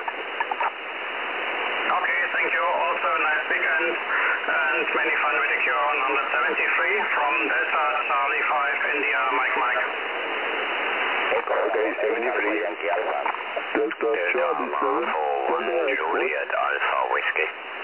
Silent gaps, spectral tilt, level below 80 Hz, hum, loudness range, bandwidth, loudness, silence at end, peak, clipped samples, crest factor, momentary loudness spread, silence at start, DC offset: none; -5 dB/octave; -74 dBFS; none; 3 LU; 4 kHz; -23 LUFS; 0 s; -6 dBFS; under 0.1%; 18 dB; 5 LU; 0 s; 0.1%